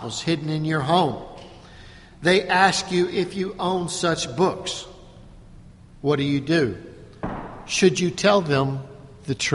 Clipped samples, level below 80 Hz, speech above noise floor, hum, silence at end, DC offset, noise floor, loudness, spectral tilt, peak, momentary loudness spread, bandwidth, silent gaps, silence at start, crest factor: under 0.1%; -50 dBFS; 24 dB; none; 0 s; under 0.1%; -45 dBFS; -22 LUFS; -4.5 dB/octave; -2 dBFS; 17 LU; 11.5 kHz; none; 0 s; 20 dB